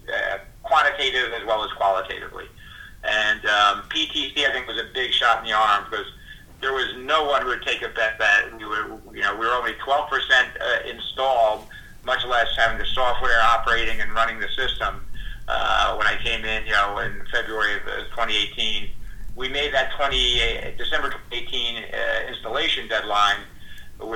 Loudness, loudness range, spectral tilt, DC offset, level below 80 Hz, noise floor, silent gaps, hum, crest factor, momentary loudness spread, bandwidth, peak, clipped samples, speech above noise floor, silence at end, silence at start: -22 LUFS; 2 LU; -2 dB/octave; under 0.1%; -38 dBFS; -42 dBFS; none; none; 18 dB; 12 LU; 16 kHz; -4 dBFS; under 0.1%; 20 dB; 0 s; 0.05 s